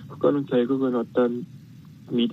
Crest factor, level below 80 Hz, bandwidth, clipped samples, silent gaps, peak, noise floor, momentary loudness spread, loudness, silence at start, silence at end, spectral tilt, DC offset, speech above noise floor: 16 dB; -68 dBFS; 6 kHz; under 0.1%; none; -8 dBFS; -46 dBFS; 9 LU; -24 LUFS; 0 s; 0 s; -8.5 dB/octave; under 0.1%; 22 dB